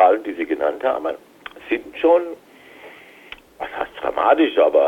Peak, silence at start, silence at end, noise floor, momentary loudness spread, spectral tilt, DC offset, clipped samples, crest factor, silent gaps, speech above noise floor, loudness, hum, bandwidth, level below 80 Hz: -2 dBFS; 0 s; 0 s; -43 dBFS; 24 LU; -5 dB/octave; under 0.1%; under 0.1%; 18 dB; none; 24 dB; -20 LUFS; none; 6.8 kHz; -58 dBFS